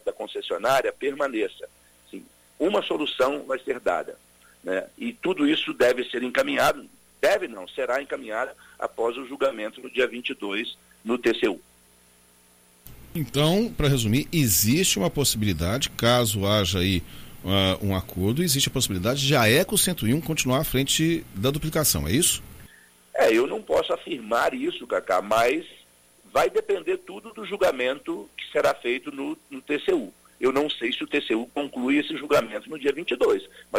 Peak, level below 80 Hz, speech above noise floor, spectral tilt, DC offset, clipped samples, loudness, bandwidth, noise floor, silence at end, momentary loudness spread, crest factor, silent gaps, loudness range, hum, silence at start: -6 dBFS; -48 dBFS; 33 dB; -4 dB/octave; under 0.1%; under 0.1%; -24 LUFS; 16.5 kHz; -57 dBFS; 0 s; 12 LU; 18 dB; none; 6 LU; 60 Hz at -55 dBFS; 0.05 s